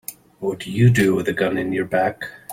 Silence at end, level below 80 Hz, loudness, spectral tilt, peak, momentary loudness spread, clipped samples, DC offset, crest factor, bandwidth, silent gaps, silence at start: 0 s; -52 dBFS; -20 LUFS; -6.5 dB/octave; -4 dBFS; 13 LU; under 0.1%; under 0.1%; 16 dB; 16.5 kHz; none; 0.1 s